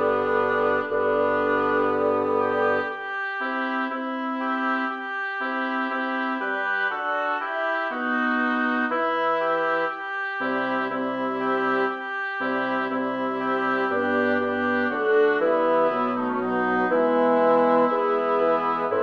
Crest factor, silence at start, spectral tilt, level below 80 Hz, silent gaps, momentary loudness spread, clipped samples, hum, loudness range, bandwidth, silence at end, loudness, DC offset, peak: 16 dB; 0 s; -6.5 dB/octave; -72 dBFS; none; 6 LU; under 0.1%; none; 4 LU; 6.6 kHz; 0 s; -23 LUFS; under 0.1%; -8 dBFS